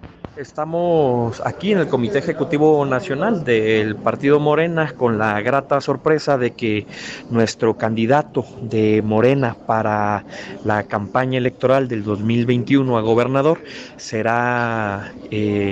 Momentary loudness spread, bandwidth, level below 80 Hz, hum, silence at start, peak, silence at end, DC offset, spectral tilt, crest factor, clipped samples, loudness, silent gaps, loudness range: 9 LU; 8.2 kHz; -54 dBFS; none; 0.05 s; -2 dBFS; 0 s; under 0.1%; -7 dB/octave; 16 dB; under 0.1%; -19 LUFS; none; 2 LU